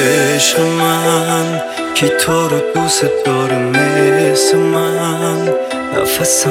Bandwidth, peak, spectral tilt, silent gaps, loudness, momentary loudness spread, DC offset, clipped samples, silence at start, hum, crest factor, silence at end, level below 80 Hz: 17 kHz; 0 dBFS; -3.5 dB/octave; none; -13 LUFS; 5 LU; under 0.1%; under 0.1%; 0 s; none; 12 dB; 0 s; -50 dBFS